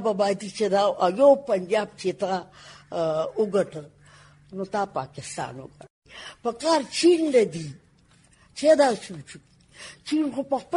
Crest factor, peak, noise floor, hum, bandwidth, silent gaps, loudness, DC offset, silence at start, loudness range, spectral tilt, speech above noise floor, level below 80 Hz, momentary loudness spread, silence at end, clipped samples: 18 dB; -6 dBFS; -58 dBFS; none; 11.5 kHz; 5.90-6.02 s; -24 LUFS; under 0.1%; 0 s; 7 LU; -5 dB/octave; 34 dB; -64 dBFS; 22 LU; 0 s; under 0.1%